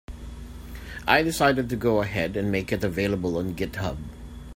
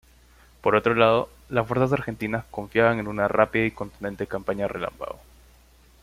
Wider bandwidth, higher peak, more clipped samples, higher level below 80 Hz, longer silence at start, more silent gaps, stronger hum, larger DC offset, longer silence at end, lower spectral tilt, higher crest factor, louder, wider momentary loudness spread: about the same, 16 kHz vs 15.5 kHz; about the same, -2 dBFS vs -4 dBFS; neither; first, -42 dBFS vs -50 dBFS; second, 0.1 s vs 0.65 s; neither; neither; neither; second, 0 s vs 0.9 s; second, -5.5 dB/octave vs -7 dB/octave; about the same, 24 dB vs 22 dB; about the same, -25 LUFS vs -24 LUFS; first, 19 LU vs 13 LU